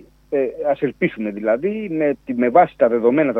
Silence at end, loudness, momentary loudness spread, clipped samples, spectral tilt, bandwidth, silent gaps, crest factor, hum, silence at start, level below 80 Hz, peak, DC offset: 0 s; -19 LUFS; 8 LU; under 0.1%; -9 dB/octave; 4.2 kHz; none; 18 dB; none; 0.3 s; -56 dBFS; -2 dBFS; under 0.1%